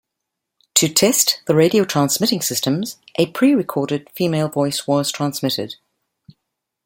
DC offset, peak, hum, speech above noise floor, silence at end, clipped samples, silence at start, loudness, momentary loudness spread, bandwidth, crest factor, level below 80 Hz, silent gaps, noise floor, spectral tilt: under 0.1%; 0 dBFS; none; 62 dB; 1.1 s; under 0.1%; 0.75 s; -18 LUFS; 9 LU; 17 kHz; 20 dB; -62 dBFS; none; -80 dBFS; -4 dB/octave